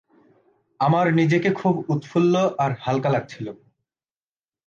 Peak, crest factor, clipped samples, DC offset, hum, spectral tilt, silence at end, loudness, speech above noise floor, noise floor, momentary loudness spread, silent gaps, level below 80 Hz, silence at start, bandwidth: -8 dBFS; 16 dB; under 0.1%; under 0.1%; none; -7.5 dB/octave; 1.1 s; -21 LUFS; over 69 dB; under -90 dBFS; 8 LU; none; -66 dBFS; 0.8 s; 7.4 kHz